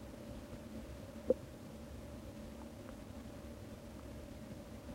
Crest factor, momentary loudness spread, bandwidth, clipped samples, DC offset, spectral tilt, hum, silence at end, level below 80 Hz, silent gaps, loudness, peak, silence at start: 28 dB; 12 LU; 16 kHz; under 0.1%; under 0.1%; -6.5 dB/octave; none; 0 s; -56 dBFS; none; -47 LUFS; -18 dBFS; 0 s